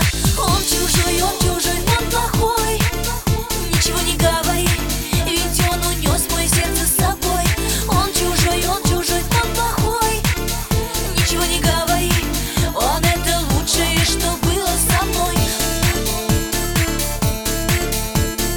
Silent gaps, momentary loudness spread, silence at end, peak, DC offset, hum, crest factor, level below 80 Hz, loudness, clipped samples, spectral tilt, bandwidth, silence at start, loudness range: none; 4 LU; 0 s; -2 dBFS; under 0.1%; none; 16 dB; -24 dBFS; -17 LUFS; under 0.1%; -3.5 dB/octave; over 20 kHz; 0 s; 1 LU